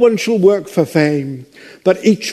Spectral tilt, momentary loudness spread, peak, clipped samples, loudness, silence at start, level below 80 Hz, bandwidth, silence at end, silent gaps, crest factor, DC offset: -6 dB/octave; 10 LU; 0 dBFS; under 0.1%; -14 LUFS; 0 s; -60 dBFS; 13.5 kHz; 0 s; none; 14 dB; under 0.1%